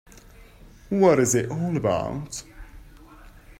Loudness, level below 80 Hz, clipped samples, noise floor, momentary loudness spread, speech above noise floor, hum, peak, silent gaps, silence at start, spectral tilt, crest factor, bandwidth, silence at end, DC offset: -23 LUFS; -48 dBFS; under 0.1%; -48 dBFS; 16 LU; 26 dB; none; -6 dBFS; none; 0.4 s; -5.5 dB/octave; 20 dB; 16 kHz; 0.05 s; under 0.1%